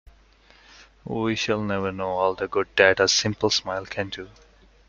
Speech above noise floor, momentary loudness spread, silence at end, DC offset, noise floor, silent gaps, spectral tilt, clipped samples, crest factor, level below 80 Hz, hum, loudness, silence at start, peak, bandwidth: 31 dB; 15 LU; 0.6 s; under 0.1%; -55 dBFS; none; -3 dB/octave; under 0.1%; 22 dB; -54 dBFS; none; -23 LUFS; 0.8 s; -2 dBFS; 7.4 kHz